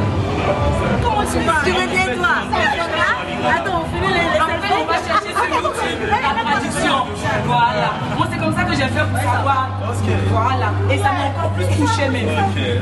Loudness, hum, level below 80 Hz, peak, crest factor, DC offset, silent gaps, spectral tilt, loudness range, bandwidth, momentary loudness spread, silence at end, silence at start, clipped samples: -17 LUFS; none; -34 dBFS; -2 dBFS; 16 dB; under 0.1%; none; -5.5 dB/octave; 1 LU; 12.5 kHz; 3 LU; 0 s; 0 s; under 0.1%